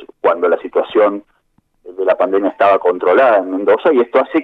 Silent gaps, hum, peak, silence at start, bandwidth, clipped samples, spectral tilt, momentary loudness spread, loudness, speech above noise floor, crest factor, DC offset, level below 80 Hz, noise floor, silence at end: none; none; 0 dBFS; 0.25 s; 4.8 kHz; under 0.1%; -7 dB/octave; 6 LU; -14 LUFS; 47 dB; 14 dB; under 0.1%; -62 dBFS; -60 dBFS; 0 s